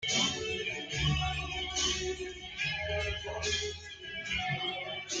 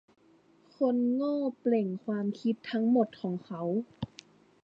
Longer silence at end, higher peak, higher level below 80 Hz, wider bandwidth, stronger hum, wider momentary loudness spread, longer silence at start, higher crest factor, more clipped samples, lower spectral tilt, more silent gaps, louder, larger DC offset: second, 0 s vs 0.55 s; about the same, -16 dBFS vs -14 dBFS; first, -48 dBFS vs -70 dBFS; first, 10 kHz vs 7.2 kHz; neither; about the same, 9 LU vs 9 LU; second, 0 s vs 0.8 s; about the same, 18 dB vs 18 dB; neither; second, -2.5 dB/octave vs -8.5 dB/octave; neither; about the same, -33 LUFS vs -31 LUFS; neither